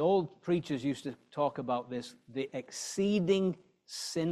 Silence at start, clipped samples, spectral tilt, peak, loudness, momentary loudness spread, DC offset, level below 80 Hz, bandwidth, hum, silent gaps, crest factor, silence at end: 0 s; under 0.1%; -5.5 dB/octave; -16 dBFS; -34 LUFS; 12 LU; under 0.1%; -72 dBFS; 13.5 kHz; none; none; 16 dB; 0 s